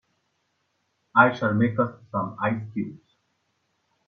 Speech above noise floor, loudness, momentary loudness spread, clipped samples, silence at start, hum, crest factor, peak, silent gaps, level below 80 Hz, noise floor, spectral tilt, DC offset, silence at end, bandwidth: 50 dB; -24 LUFS; 13 LU; under 0.1%; 1.15 s; none; 24 dB; -2 dBFS; none; -64 dBFS; -73 dBFS; -8.5 dB/octave; under 0.1%; 1.1 s; 6.6 kHz